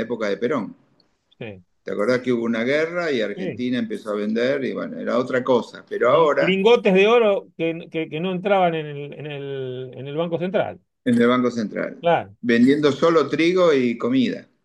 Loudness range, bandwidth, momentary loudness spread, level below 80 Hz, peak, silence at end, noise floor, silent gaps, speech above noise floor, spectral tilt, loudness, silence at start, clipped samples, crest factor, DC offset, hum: 6 LU; 10.5 kHz; 14 LU; -68 dBFS; -4 dBFS; 0.2 s; -63 dBFS; none; 42 dB; -6.5 dB/octave; -20 LUFS; 0 s; under 0.1%; 16 dB; under 0.1%; none